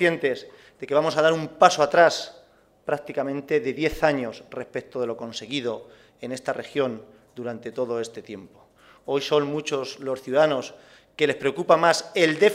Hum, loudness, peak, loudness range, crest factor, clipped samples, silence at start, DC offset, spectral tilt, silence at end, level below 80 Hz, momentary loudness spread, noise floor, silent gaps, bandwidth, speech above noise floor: none; -24 LUFS; 0 dBFS; 9 LU; 24 dB; under 0.1%; 0 s; under 0.1%; -4 dB/octave; 0 s; -56 dBFS; 18 LU; -56 dBFS; none; 15.5 kHz; 32 dB